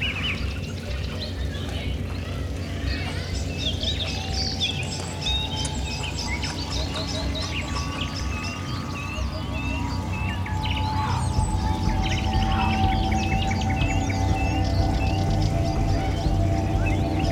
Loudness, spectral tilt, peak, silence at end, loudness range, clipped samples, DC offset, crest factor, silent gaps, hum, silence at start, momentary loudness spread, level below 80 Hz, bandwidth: -26 LUFS; -5 dB/octave; -8 dBFS; 0 s; 5 LU; under 0.1%; under 0.1%; 16 dB; none; none; 0 s; 6 LU; -30 dBFS; 13.5 kHz